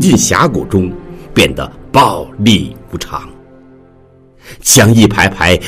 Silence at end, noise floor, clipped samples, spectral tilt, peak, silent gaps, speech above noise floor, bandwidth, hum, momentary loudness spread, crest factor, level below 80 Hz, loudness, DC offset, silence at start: 0 s; -43 dBFS; 0.3%; -4 dB/octave; 0 dBFS; none; 33 dB; over 20 kHz; none; 16 LU; 12 dB; -34 dBFS; -10 LUFS; under 0.1%; 0 s